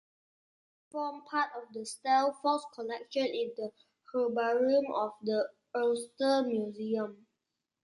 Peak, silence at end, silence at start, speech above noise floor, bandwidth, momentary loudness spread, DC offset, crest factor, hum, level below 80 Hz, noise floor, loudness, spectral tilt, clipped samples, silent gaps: -16 dBFS; 0.7 s; 0.95 s; 55 dB; 11.5 kHz; 12 LU; under 0.1%; 18 dB; none; -84 dBFS; -86 dBFS; -32 LUFS; -4 dB/octave; under 0.1%; none